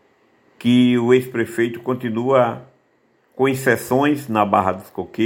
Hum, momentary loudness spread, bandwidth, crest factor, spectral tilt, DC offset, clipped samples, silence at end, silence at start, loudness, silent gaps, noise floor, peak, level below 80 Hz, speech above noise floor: none; 9 LU; 17 kHz; 18 dB; -6 dB/octave; under 0.1%; under 0.1%; 0 s; 0.6 s; -18 LUFS; none; -61 dBFS; -2 dBFS; -62 dBFS; 43 dB